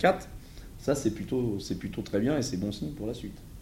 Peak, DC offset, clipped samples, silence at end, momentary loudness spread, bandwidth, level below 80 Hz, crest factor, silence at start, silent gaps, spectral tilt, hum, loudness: -8 dBFS; under 0.1%; under 0.1%; 0 s; 14 LU; 16 kHz; -48 dBFS; 22 dB; 0 s; none; -5.5 dB/octave; none; -31 LUFS